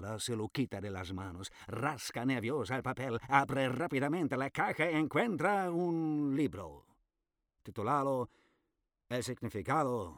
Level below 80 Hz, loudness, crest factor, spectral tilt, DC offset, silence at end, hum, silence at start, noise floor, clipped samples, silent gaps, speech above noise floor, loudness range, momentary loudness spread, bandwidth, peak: -66 dBFS; -35 LUFS; 24 dB; -5.5 dB/octave; under 0.1%; 0 s; none; 0 s; -87 dBFS; under 0.1%; none; 53 dB; 5 LU; 11 LU; 19.5 kHz; -12 dBFS